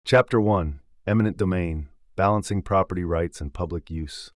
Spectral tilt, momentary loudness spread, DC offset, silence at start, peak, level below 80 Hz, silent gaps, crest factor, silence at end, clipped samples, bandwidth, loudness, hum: -7 dB/octave; 12 LU; under 0.1%; 0.05 s; -6 dBFS; -42 dBFS; none; 16 dB; 0.1 s; under 0.1%; 12 kHz; -25 LUFS; none